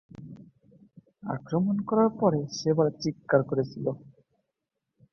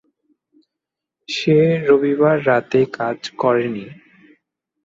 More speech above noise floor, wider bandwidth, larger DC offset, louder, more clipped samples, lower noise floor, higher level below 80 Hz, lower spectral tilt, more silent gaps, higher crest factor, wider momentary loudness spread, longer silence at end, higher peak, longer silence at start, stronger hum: second, 58 dB vs 67 dB; about the same, 7.2 kHz vs 7.8 kHz; neither; second, -27 LUFS vs -17 LUFS; neither; about the same, -84 dBFS vs -84 dBFS; about the same, -66 dBFS vs -62 dBFS; about the same, -7 dB/octave vs -6.5 dB/octave; neither; first, 22 dB vs 16 dB; first, 18 LU vs 11 LU; first, 1.15 s vs 0.9 s; second, -8 dBFS vs -2 dBFS; second, 0.2 s vs 1.3 s; neither